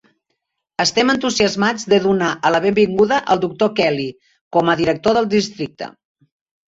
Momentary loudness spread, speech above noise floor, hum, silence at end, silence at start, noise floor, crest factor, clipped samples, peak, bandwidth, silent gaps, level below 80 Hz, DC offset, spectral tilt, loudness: 12 LU; 57 dB; none; 0.8 s; 0.8 s; -74 dBFS; 16 dB; under 0.1%; -2 dBFS; 8 kHz; 4.41-4.51 s; -54 dBFS; under 0.1%; -4.5 dB/octave; -17 LUFS